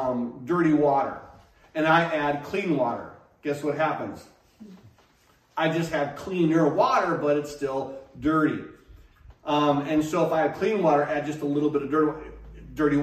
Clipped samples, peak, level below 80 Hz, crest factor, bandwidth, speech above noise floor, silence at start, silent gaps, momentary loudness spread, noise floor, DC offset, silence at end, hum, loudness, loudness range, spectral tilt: under 0.1%; -6 dBFS; -54 dBFS; 18 dB; 14 kHz; 37 dB; 0 s; none; 16 LU; -61 dBFS; under 0.1%; 0 s; none; -25 LUFS; 5 LU; -6.5 dB/octave